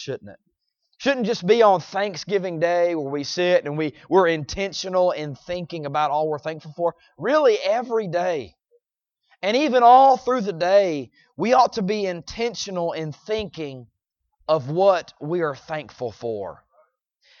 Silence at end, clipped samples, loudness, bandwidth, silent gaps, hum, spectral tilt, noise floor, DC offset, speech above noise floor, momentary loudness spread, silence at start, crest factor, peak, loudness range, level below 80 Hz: 0.85 s; under 0.1%; -21 LUFS; 7.2 kHz; none; none; -5 dB/octave; -79 dBFS; under 0.1%; 58 dB; 14 LU; 0 s; 20 dB; -2 dBFS; 7 LU; -56 dBFS